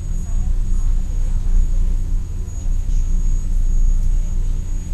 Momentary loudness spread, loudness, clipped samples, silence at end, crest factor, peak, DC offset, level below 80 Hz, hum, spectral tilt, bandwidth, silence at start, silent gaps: 5 LU; -24 LUFS; under 0.1%; 0 s; 10 dB; -6 dBFS; under 0.1%; -16 dBFS; none; -6.5 dB/octave; 8.2 kHz; 0 s; none